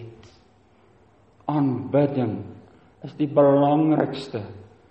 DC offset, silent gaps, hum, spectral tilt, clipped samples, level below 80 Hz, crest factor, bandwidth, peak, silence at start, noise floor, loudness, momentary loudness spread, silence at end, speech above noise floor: under 0.1%; none; none; -9.5 dB/octave; under 0.1%; -64 dBFS; 18 dB; 8.4 kHz; -6 dBFS; 0 s; -57 dBFS; -22 LUFS; 23 LU; 0.25 s; 36 dB